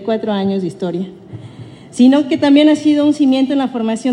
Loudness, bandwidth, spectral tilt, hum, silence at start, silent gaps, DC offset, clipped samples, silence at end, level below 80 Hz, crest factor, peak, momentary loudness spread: -14 LUFS; 10.5 kHz; -6 dB/octave; none; 0 s; none; under 0.1%; under 0.1%; 0 s; -60 dBFS; 14 dB; 0 dBFS; 19 LU